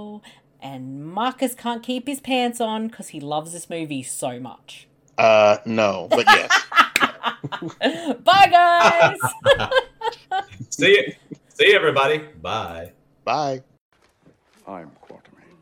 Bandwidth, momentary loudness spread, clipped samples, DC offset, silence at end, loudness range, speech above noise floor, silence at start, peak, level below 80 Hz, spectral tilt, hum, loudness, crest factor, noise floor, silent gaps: 18 kHz; 20 LU; under 0.1%; under 0.1%; 0.75 s; 10 LU; 38 dB; 0 s; -2 dBFS; -56 dBFS; -3 dB/octave; none; -18 LUFS; 18 dB; -57 dBFS; 13.81-13.91 s